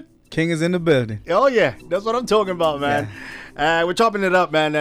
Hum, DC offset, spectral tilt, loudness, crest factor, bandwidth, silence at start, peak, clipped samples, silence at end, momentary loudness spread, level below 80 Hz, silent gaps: none; under 0.1%; -5.5 dB/octave; -19 LUFS; 14 dB; 14.5 kHz; 0 s; -6 dBFS; under 0.1%; 0 s; 7 LU; -48 dBFS; none